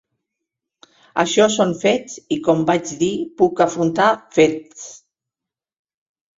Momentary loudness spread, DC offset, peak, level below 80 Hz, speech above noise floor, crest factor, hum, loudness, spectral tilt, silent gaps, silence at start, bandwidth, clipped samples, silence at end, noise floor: 11 LU; under 0.1%; -2 dBFS; -60 dBFS; 70 dB; 18 dB; none; -18 LUFS; -4.5 dB/octave; none; 1.15 s; 7.8 kHz; under 0.1%; 1.4 s; -87 dBFS